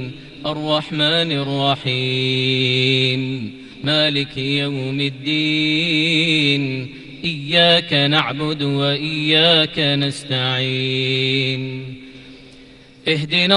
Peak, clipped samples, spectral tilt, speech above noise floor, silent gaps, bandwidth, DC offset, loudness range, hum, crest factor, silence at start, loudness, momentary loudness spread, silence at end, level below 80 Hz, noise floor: -2 dBFS; under 0.1%; -5.5 dB/octave; 25 dB; none; 11.5 kHz; under 0.1%; 3 LU; none; 16 dB; 0 s; -17 LUFS; 12 LU; 0 s; -52 dBFS; -44 dBFS